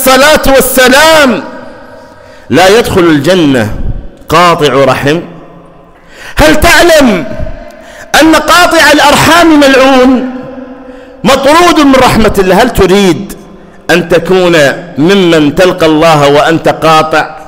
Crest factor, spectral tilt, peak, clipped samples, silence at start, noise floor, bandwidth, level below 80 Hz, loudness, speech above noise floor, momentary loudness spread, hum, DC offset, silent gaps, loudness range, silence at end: 6 dB; -4 dB/octave; 0 dBFS; 0.6%; 0 s; -34 dBFS; 16.5 kHz; -24 dBFS; -5 LUFS; 30 dB; 13 LU; none; under 0.1%; none; 4 LU; 0.05 s